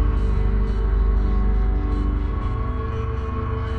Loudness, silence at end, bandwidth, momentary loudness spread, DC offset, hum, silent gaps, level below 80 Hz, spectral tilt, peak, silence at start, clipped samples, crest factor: -24 LUFS; 0 s; 4.5 kHz; 4 LU; 0.4%; none; none; -20 dBFS; -9.5 dB/octave; -10 dBFS; 0 s; under 0.1%; 10 dB